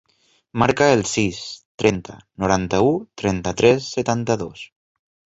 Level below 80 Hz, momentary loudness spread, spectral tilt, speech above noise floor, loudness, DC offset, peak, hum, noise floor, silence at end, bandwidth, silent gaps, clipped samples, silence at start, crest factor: -46 dBFS; 16 LU; -5 dB/octave; 43 dB; -20 LUFS; under 0.1%; 0 dBFS; none; -62 dBFS; 0.75 s; 8 kHz; 1.65-1.78 s; under 0.1%; 0.55 s; 20 dB